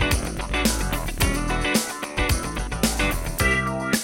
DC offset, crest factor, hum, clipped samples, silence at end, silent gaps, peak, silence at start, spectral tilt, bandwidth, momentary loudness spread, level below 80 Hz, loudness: under 0.1%; 18 dB; none; under 0.1%; 0 s; none; -6 dBFS; 0 s; -3.5 dB/octave; 17 kHz; 5 LU; -30 dBFS; -23 LUFS